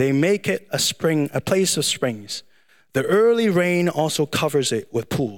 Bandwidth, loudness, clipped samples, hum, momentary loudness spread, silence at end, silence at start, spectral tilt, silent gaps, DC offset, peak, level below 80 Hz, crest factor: 17.5 kHz; -20 LUFS; under 0.1%; none; 8 LU; 0 s; 0 s; -4.5 dB/octave; none; 0.2%; -6 dBFS; -60 dBFS; 14 dB